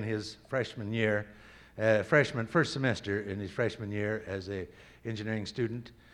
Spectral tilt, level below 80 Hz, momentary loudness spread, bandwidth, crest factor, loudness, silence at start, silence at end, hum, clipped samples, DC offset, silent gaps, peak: -6 dB/octave; -62 dBFS; 14 LU; 11.5 kHz; 22 dB; -32 LUFS; 0 s; 0.2 s; none; under 0.1%; under 0.1%; none; -10 dBFS